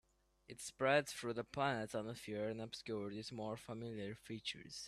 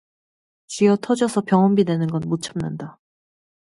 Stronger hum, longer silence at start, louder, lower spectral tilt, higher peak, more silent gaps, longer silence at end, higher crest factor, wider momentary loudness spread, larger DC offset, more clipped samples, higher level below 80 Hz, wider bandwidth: neither; second, 0.5 s vs 0.7 s; second, -43 LUFS vs -20 LUFS; second, -4.5 dB/octave vs -6.5 dB/octave; second, -20 dBFS vs -4 dBFS; neither; second, 0 s vs 0.85 s; about the same, 22 dB vs 18 dB; second, 12 LU vs 15 LU; neither; neither; second, -74 dBFS vs -60 dBFS; first, 14 kHz vs 11.5 kHz